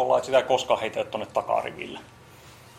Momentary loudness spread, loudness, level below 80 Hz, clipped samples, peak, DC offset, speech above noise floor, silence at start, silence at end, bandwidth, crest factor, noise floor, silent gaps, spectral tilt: 15 LU; -25 LUFS; -62 dBFS; under 0.1%; -6 dBFS; under 0.1%; 24 dB; 0 s; 0 s; 15 kHz; 20 dB; -49 dBFS; none; -3.5 dB/octave